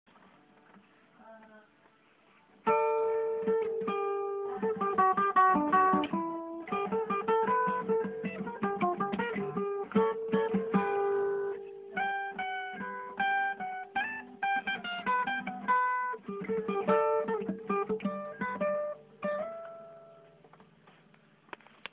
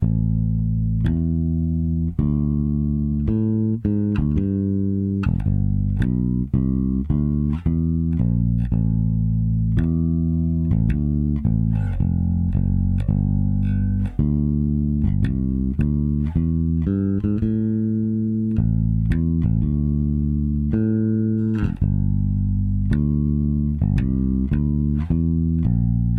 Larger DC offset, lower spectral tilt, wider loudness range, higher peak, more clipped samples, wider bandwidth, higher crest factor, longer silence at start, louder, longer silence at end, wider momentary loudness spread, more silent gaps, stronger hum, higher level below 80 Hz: neither; second, -4 dB/octave vs -11.5 dB/octave; first, 7 LU vs 1 LU; second, -14 dBFS vs -8 dBFS; neither; about the same, 4 kHz vs 3.9 kHz; first, 18 dB vs 10 dB; first, 1.2 s vs 0 s; second, -31 LUFS vs -21 LUFS; first, 1 s vs 0 s; first, 11 LU vs 2 LU; neither; neither; second, -70 dBFS vs -28 dBFS